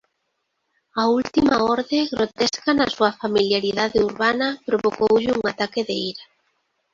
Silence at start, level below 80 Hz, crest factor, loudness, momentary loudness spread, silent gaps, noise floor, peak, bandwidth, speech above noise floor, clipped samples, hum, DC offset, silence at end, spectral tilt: 0.95 s; -54 dBFS; 18 dB; -21 LUFS; 6 LU; none; -74 dBFS; -4 dBFS; 7.6 kHz; 54 dB; under 0.1%; none; under 0.1%; 0.7 s; -4.5 dB/octave